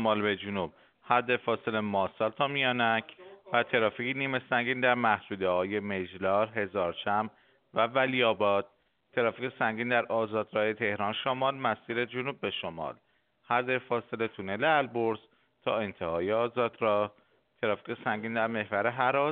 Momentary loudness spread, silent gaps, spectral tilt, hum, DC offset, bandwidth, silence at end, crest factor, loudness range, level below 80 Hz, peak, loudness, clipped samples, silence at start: 8 LU; none; -2.5 dB/octave; none; under 0.1%; 4.6 kHz; 0 s; 22 dB; 3 LU; -72 dBFS; -8 dBFS; -30 LUFS; under 0.1%; 0 s